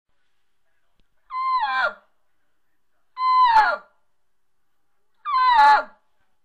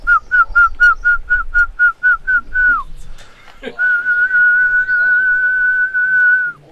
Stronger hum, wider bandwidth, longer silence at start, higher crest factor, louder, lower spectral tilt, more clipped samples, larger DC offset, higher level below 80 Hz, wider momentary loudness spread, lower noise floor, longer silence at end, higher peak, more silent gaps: neither; first, 9.6 kHz vs 7.6 kHz; first, 1.3 s vs 0 s; about the same, 16 dB vs 12 dB; second, -19 LUFS vs -12 LUFS; second, -1 dB/octave vs -3 dB/octave; neither; neither; second, -58 dBFS vs -32 dBFS; first, 17 LU vs 5 LU; first, -78 dBFS vs -35 dBFS; first, 0.55 s vs 0.2 s; second, -6 dBFS vs -2 dBFS; neither